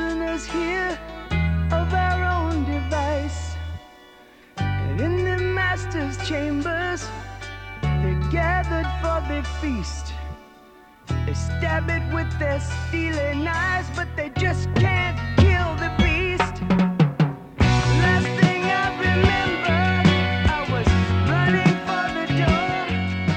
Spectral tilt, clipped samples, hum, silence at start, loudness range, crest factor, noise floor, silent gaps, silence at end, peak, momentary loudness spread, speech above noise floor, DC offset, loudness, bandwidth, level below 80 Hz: -6.5 dB/octave; under 0.1%; none; 0 s; 6 LU; 18 dB; -49 dBFS; none; 0 s; -4 dBFS; 10 LU; 26 dB; under 0.1%; -22 LUFS; 9.2 kHz; -32 dBFS